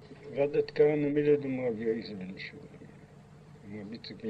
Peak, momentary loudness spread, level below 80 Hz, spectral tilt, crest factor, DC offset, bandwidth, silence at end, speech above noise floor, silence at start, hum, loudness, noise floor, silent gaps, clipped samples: -14 dBFS; 22 LU; -66 dBFS; -8 dB/octave; 18 dB; under 0.1%; 6 kHz; 0 s; 23 dB; 0 s; 50 Hz at -55 dBFS; -30 LUFS; -53 dBFS; none; under 0.1%